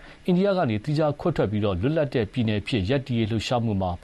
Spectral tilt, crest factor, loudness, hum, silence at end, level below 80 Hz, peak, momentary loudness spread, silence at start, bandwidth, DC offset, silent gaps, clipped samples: -7.5 dB/octave; 12 dB; -24 LUFS; none; 0.05 s; -48 dBFS; -12 dBFS; 3 LU; 0 s; 11.5 kHz; under 0.1%; none; under 0.1%